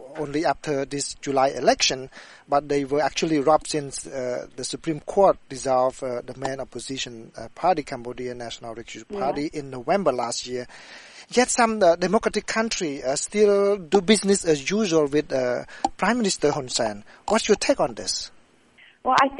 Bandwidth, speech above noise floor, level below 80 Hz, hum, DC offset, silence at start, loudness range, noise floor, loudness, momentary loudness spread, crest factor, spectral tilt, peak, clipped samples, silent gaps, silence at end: 11.5 kHz; 31 dB; -52 dBFS; none; under 0.1%; 0 s; 7 LU; -54 dBFS; -23 LUFS; 14 LU; 20 dB; -3.5 dB/octave; -4 dBFS; under 0.1%; none; 0 s